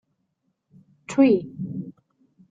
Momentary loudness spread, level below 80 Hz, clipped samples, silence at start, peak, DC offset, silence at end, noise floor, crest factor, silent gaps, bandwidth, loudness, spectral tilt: 17 LU; -68 dBFS; under 0.1%; 1.1 s; -6 dBFS; under 0.1%; 0.6 s; -74 dBFS; 20 dB; none; 9 kHz; -22 LUFS; -7 dB/octave